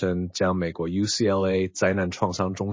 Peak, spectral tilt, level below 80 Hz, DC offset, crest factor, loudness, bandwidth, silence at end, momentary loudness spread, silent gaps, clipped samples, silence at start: -6 dBFS; -5 dB/octave; -44 dBFS; under 0.1%; 18 dB; -25 LUFS; 7.6 kHz; 0 s; 5 LU; none; under 0.1%; 0 s